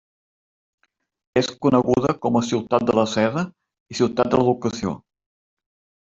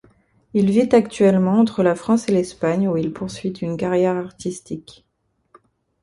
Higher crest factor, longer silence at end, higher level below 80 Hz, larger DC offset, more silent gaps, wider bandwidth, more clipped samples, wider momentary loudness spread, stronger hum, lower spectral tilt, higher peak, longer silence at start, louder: about the same, 20 dB vs 18 dB; about the same, 1.15 s vs 1.25 s; about the same, -54 dBFS vs -56 dBFS; neither; first, 3.80-3.86 s vs none; second, 7.8 kHz vs 11.5 kHz; neither; second, 10 LU vs 13 LU; neither; about the same, -6 dB/octave vs -7 dB/octave; about the same, -2 dBFS vs -2 dBFS; first, 1.35 s vs 0.55 s; about the same, -21 LUFS vs -19 LUFS